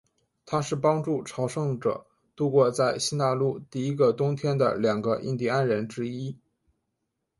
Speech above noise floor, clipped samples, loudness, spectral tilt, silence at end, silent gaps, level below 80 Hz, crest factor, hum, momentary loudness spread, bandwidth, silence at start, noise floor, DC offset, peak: 55 dB; under 0.1%; -26 LUFS; -6 dB/octave; 1.05 s; none; -66 dBFS; 18 dB; none; 8 LU; 11.5 kHz; 0.45 s; -80 dBFS; under 0.1%; -10 dBFS